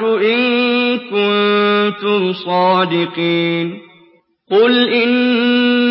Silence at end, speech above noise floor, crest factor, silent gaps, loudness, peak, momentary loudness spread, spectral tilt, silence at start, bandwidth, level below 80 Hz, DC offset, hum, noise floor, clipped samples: 0 s; 37 dB; 12 dB; none; -14 LUFS; -2 dBFS; 5 LU; -10.5 dB/octave; 0 s; 5.8 kHz; -72 dBFS; under 0.1%; none; -51 dBFS; under 0.1%